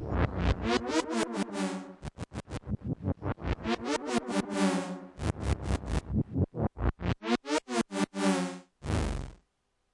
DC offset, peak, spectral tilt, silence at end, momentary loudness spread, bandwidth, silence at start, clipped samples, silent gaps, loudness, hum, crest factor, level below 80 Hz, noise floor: under 0.1%; -14 dBFS; -5.5 dB/octave; 0.6 s; 11 LU; 11.5 kHz; 0 s; under 0.1%; none; -32 LUFS; none; 18 dB; -40 dBFS; -77 dBFS